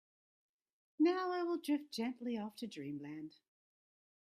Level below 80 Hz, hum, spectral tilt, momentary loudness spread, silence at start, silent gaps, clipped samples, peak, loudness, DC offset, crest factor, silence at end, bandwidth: -88 dBFS; none; -5.5 dB/octave; 14 LU; 1 s; none; under 0.1%; -24 dBFS; -39 LUFS; under 0.1%; 18 dB; 0.9 s; 14.5 kHz